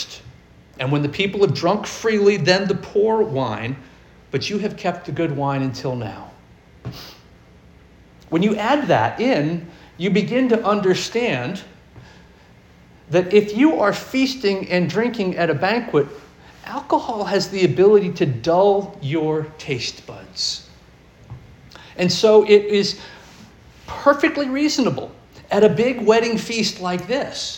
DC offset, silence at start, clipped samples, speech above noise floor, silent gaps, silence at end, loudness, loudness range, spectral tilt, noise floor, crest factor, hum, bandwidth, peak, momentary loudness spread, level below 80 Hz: under 0.1%; 0 s; under 0.1%; 30 dB; none; 0 s; -19 LUFS; 7 LU; -5.5 dB/octave; -48 dBFS; 18 dB; none; 17 kHz; -2 dBFS; 15 LU; -52 dBFS